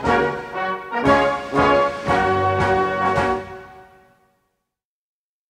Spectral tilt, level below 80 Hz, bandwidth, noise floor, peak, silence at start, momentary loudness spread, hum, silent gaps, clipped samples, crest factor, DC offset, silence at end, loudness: -6 dB/octave; -44 dBFS; 12 kHz; -83 dBFS; -2 dBFS; 0 s; 9 LU; none; none; under 0.1%; 18 dB; under 0.1%; 1.65 s; -19 LUFS